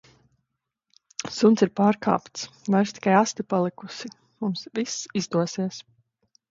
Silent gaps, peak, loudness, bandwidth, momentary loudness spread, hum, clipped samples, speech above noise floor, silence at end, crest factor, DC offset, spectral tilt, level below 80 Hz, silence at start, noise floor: none; -4 dBFS; -24 LUFS; 7.8 kHz; 17 LU; none; under 0.1%; 57 dB; 0.7 s; 20 dB; under 0.1%; -5.5 dB/octave; -68 dBFS; 1.2 s; -81 dBFS